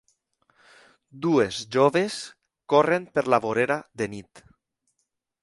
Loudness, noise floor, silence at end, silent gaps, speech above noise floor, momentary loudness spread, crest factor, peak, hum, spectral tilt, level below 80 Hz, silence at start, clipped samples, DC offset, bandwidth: -24 LUFS; -78 dBFS; 1.05 s; none; 55 dB; 11 LU; 22 dB; -4 dBFS; none; -5 dB/octave; -64 dBFS; 1.15 s; under 0.1%; under 0.1%; 11.5 kHz